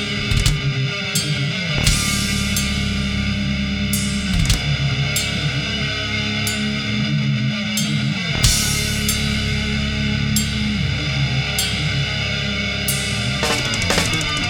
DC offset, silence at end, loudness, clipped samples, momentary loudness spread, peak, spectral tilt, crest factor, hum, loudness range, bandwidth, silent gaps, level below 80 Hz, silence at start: under 0.1%; 0 s; -19 LUFS; under 0.1%; 4 LU; 0 dBFS; -3.5 dB/octave; 20 dB; none; 1 LU; 19.5 kHz; none; -28 dBFS; 0 s